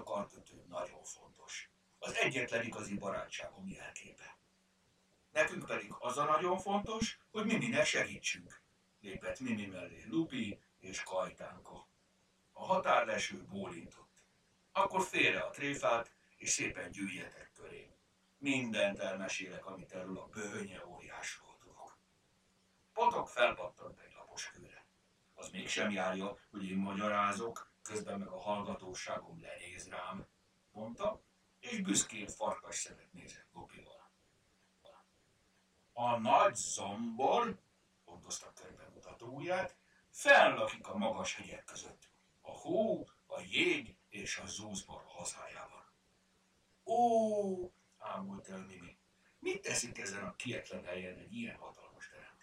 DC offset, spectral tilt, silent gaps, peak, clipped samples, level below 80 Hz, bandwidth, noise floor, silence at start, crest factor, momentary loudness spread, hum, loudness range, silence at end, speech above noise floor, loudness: under 0.1%; -3 dB/octave; none; -12 dBFS; under 0.1%; -70 dBFS; 16 kHz; -74 dBFS; 0 s; 26 dB; 22 LU; none; 9 LU; 0.1 s; 36 dB; -37 LUFS